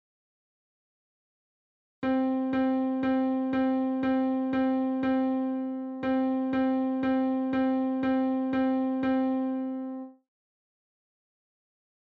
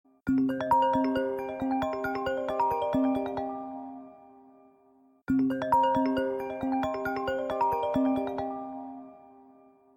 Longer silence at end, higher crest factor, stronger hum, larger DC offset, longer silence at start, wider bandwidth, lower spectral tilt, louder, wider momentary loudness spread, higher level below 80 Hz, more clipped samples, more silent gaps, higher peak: first, 1.95 s vs 0.7 s; second, 10 dB vs 16 dB; neither; neither; first, 2 s vs 0.25 s; second, 4.7 kHz vs 13.5 kHz; first, -8.5 dB/octave vs -7 dB/octave; about the same, -28 LUFS vs -29 LUFS; second, 6 LU vs 15 LU; second, -64 dBFS vs -58 dBFS; neither; neither; second, -18 dBFS vs -12 dBFS